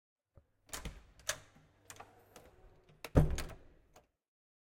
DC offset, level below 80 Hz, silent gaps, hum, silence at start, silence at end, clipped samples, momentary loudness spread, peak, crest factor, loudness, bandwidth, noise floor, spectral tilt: under 0.1%; -46 dBFS; none; none; 0.7 s; 1.2 s; under 0.1%; 27 LU; -12 dBFS; 28 dB; -38 LUFS; 16.5 kHz; -69 dBFS; -5.5 dB/octave